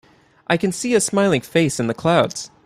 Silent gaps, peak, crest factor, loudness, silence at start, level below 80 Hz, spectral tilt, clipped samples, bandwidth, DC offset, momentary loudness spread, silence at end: none; -2 dBFS; 18 dB; -19 LUFS; 0.5 s; -56 dBFS; -4.5 dB/octave; under 0.1%; 15.5 kHz; under 0.1%; 5 LU; 0.2 s